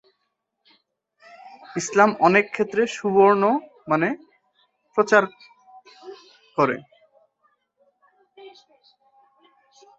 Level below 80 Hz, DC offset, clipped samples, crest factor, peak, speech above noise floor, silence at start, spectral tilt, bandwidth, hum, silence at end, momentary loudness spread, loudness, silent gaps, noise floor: -70 dBFS; under 0.1%; under 0.1%; 22 dB; -2 dBFS; 57 dB; 1.45 s; -5 dB/octave; 8 kHz; none; 1.5 s; 17 LU; -21 LUFS; none; -76 dBFS